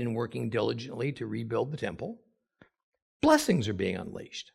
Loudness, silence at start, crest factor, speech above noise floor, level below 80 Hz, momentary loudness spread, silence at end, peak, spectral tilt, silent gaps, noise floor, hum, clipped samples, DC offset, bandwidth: -30 LUFS; 0 s; 22 dB; 34 dB; -62 dBFS; 16 LU; 0.15 s; -8 dBFS; -5.5 dB/octave; 2.83-2.92 s, 3.02-3.20 s; -64 dBFS; none; under 0.1%; under 0.1%; 15.5 kHz